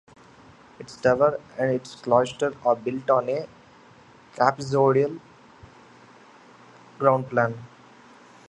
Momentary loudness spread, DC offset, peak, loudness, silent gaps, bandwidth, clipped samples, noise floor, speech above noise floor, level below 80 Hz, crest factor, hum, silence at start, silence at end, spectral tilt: 12 LU; under 0.1%; -2 dBFS; -23 LUFS; none; 9.8 kHz; under 0.1%; -52 dBFS; 29 dB; -62 dBFS; 24 dB; none; 0.8 s; 0.85 s; -6.5 dB/octave